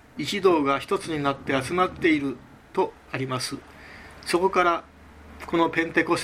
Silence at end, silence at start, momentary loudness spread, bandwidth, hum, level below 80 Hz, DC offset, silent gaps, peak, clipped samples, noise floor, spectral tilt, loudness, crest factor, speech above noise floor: 0 s; 0.15 s; 17 LU; 15 kHz; none; -54 dBFS; under 0.1%; none; -6 dBFS; under 0.1%; -47 dBFS; -5 dB/octave; -25 LUFS; 20 dB; 22 dB